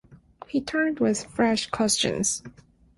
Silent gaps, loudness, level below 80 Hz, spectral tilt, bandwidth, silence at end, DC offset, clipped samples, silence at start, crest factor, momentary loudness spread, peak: none; -25 LUFS; -56 dBFS; -3 dB/octave; 12 kHz; 0.5 s; under 0.1%; under 0.1%; 0.1 s; 18 dB; 7 LU; -10 dBFS